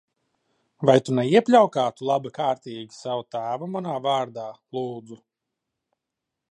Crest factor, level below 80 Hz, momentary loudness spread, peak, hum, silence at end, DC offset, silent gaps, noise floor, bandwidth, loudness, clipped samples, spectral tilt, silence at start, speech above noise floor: 22 dB; -72 dBFS; 16 LU; -4 dBFS; none; 1.35 s; under 0.1%; none; -84 dBFS; 10.5 kHz; -23 LUFS; under 0.1%; -6 dB/octave; 0.8 s; 61 dB